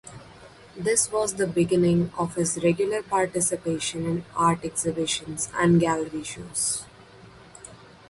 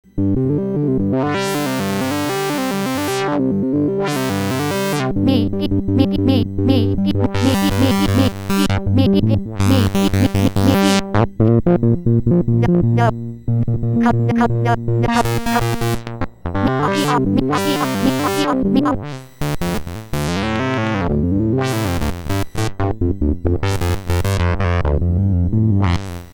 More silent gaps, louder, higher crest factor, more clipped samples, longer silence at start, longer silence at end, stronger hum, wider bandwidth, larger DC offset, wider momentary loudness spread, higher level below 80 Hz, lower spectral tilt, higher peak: neither; second, -24 LUFS vs -17 LUFS; about the same, 18 dB vs 16 dB; neither; about the same, 0.05 s vs 0.15 s; first, 0.25 s vs 0 s; neither; second, 11.5 kHz vs over 20 kHz; neither; first, 14 LU vs 6 LU; second, -56 dBFS vs -30 dBFS; second, -4.5 dB/octave vs -6.5 dB/octave; second, -8 dBFS vs 0 dBFS